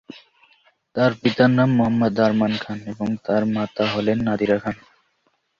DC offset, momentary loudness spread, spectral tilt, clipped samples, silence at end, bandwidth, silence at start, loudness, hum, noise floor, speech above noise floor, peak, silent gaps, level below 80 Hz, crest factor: under 0.1%; 10 LU; -7.5 dB/octave; under 0.1%; 0.85 s; 7.2 kHz; 0.15 s; -20 LUFS; none; -68 dBFS; 48 dB; -2 dBFS; none; -54 dBFS; 20 dB